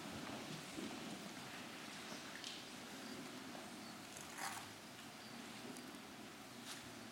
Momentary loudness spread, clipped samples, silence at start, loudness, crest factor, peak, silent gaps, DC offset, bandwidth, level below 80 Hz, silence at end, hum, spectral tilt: 6 LU; under 0.1%; 0 s; -50 LUFS; 20 dB; -32 dBFS; none; under 0.1%; 16.5 kHz; -80 dBFS; 0 s; none; -3 dB/octave